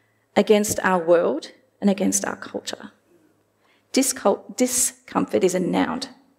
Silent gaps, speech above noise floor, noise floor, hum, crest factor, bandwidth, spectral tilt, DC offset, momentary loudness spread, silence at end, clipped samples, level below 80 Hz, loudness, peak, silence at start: none; 41 dB; -63 dBFS; none; 20 dB; 16 kHz; -4 dB/octave; under 0.1%; 13 LU; 0.3 s; under 0.1%; -62 dBFS; -22 LUFS; -2 dBFS; 0.35 s